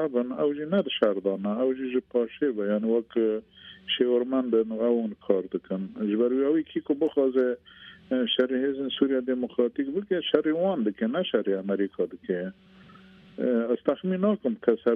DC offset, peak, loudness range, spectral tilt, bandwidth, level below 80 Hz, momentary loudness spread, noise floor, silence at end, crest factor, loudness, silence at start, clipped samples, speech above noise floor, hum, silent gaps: under 0.1%; -6 dBFS; 2 LU; -9 dB/octave; 4.3 kHz; -68 dBFS; 7 LU; -52 dBFS; 0 s; 20 dB; -27 LUFS; 0 s; under 0.1%; 25 dB; none; none